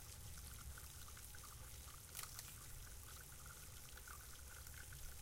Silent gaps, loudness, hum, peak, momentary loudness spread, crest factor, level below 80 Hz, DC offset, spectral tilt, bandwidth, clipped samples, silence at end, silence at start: none; -55 LUFS; none; -32 dBFS; 4 LU; 22 dB; -60 dBFS; under 0.1%; -2 dB/octave; 17 kHz; under 0.1%; 0 s; 0 s